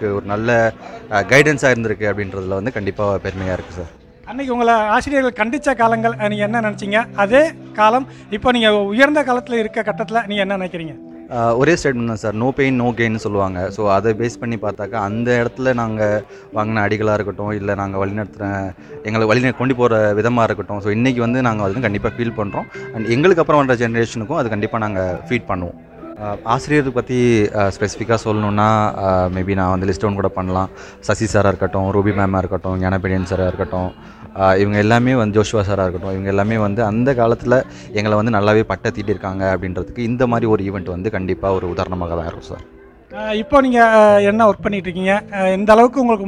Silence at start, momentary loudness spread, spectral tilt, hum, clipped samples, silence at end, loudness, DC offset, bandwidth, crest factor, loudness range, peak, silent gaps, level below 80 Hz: 0 s; 10 LU; -6.5 dB/octave; none; under 0.1%; 0 s; -17 LUFS; under 0.1%; 11 kHz; 16 dB; 4 LU; 0 dBFS; none; -42 dBFS